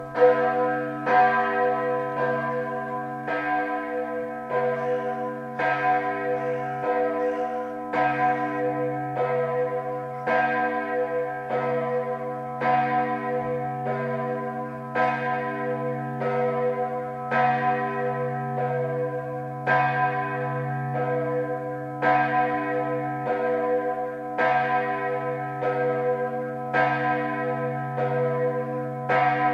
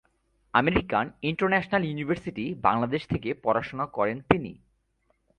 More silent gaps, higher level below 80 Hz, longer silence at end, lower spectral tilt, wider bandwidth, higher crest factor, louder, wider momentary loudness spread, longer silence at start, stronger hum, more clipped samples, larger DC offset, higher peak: neither; second, -66 dBFS vs -50 dBFS; second, 0 s vs 0.85 s; about the same, -8 dB/octave vs -8 dB/octave; second, 6.4 kHz vs 9.6 kHz; second, 18 dB vs 26 dB; about the same, -25 LUFS vs -27 LUFS; about the same, 7 LU vs 7 LU; second, 0 s vs 0.55 s; neither; neither; neither; second, -6 dBFS vs -2 dBFS